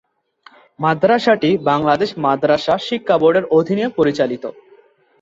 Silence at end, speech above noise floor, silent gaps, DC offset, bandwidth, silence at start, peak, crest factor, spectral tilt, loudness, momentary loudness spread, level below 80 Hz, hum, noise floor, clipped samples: 0.7 s; 35 dB; none; under 0.1%; 7.8 kHz; 0.8 s; -2 dBFS; 16 dB; -6.5 dB/octave; -16 LUFS; 6 LU; -56 dBFS; none; -51 dBFS; under 0.1%